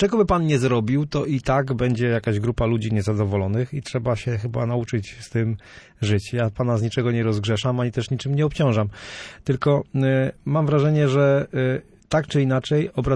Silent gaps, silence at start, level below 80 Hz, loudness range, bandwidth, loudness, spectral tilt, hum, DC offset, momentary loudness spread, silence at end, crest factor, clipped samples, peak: none; 0 s; -44 dBFS; 4 LU; 10.5 kHz; -22 LUFS; -7 dB/octave; none; under 0.1%; 7 LU; 0 s; 14 dB; under 0.1%; -8 dBFS